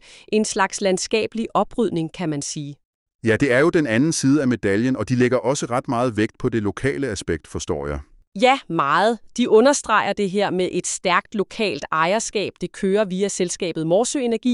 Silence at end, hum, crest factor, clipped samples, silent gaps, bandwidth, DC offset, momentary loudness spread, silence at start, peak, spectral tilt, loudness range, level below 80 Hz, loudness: 0 s; none; 18 dB; under 0.1%; 2.85-3.06 s, 3.15-3.19 s, 8.27-8.32 s; 12 kHz; under 0.1%; 9 LU; 0.1 s; -4 dBFS; -4.5 dB/octave; 3 LU; -48 dBFS; -21 LUFS